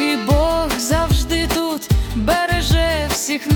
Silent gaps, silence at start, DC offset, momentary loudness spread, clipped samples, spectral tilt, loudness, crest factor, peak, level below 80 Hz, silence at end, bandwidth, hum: none; 0 s; under 0.1%; 3 LU; under 0.1%; -4.5 dB/octave; -18 LUFS; 14 dB; -4 dBFS; -24 dBFS; 0 s; 18 kHz; none